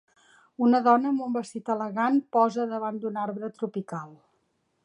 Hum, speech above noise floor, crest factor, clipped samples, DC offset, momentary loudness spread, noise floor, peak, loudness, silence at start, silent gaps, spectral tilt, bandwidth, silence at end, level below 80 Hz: none; 47 dB; 20 dB; under 0.1%; under 0.1%; 12 LU; -73 dBFS; -8 dBFS; -26 LUFS; 0.6 s; none; -7 dB/octave; 10.5 kHz; 0.7 s; -80 dBFS